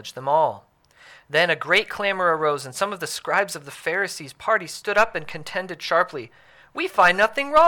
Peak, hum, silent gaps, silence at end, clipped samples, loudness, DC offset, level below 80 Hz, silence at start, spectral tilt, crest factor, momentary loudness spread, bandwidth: -6 dBFS; none; none; 0 s; under 0.1%; -22 LUFS; under 0.1%; -56 dBFS; 0.05 s; -3 dB/octave; 18 dB; 12 LU; 19 kHz